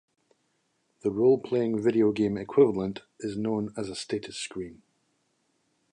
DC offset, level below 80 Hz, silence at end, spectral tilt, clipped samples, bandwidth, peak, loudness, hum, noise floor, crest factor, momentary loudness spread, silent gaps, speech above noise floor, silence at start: under 0.1%; -64 dBFS; 1.2 s; -6 dB/octave; under 0.1%; 10.5 kHz; -10 dBFS; -27 LUFS; none; -73 dBFS; 20 dB; 13 LU; none; 47 dB; 1.05 s